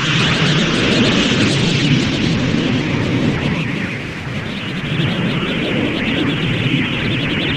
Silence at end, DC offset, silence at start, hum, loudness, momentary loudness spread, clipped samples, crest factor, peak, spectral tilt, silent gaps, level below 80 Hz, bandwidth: 0 s; under 0.1%; 0 s; none; -16 LUFS; 9 LU; under 0.1%; 14 dB; -2 dBFS; -5 dB/octave; none; -38 dBFS; 11 kHz